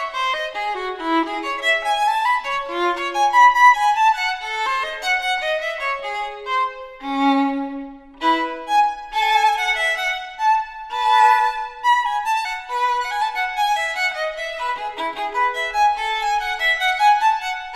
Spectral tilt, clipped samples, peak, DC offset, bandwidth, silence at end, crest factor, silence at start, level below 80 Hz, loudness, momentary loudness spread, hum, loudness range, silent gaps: -1 dB/octave; under 0.1%; -2 dBFS; under 0.1%; 14 kHz; 0 s; 18 dB; 0 s; -52 dBFS; -19 LUFS; 10 LU; none; 5 LU; none